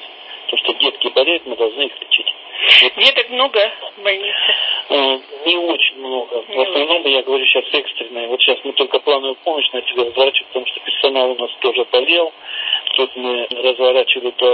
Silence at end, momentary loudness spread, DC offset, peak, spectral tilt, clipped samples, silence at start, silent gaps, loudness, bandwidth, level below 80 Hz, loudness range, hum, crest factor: 0 s; 8 LU; under 0.1%; 0 dBFS; -2 dB/octave; under 0.1%; 0 s; none; -15 LUFS; 8 kHz; -68 dBFS; 4 LU; none; 16 dB